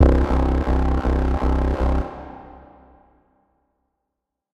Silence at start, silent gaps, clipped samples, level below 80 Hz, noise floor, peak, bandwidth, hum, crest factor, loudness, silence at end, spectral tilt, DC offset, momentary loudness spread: 0 s; none; under 0.1%; -22 dBFS; -82 dBFS; -2 dBFS; 5.8 kHz; none; 20 dB; -21 LUFS; 2.05 s; -9 dB/octave; under 0.1%; 16 LU